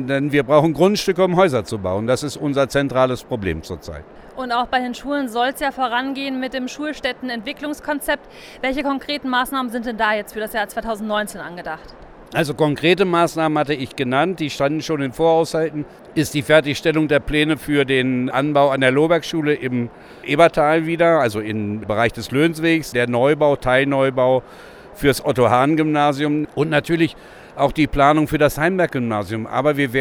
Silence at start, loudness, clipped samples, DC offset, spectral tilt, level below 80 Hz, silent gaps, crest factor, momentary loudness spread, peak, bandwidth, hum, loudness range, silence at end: 0 s; -19 LUFS; under 0.1%; under 0.1%; -5.5 dB/octave; -44 dBFS; none; 18 dB; 10 LU; 0 dBFS; over 20 kHz; none; 6 LU; 0 s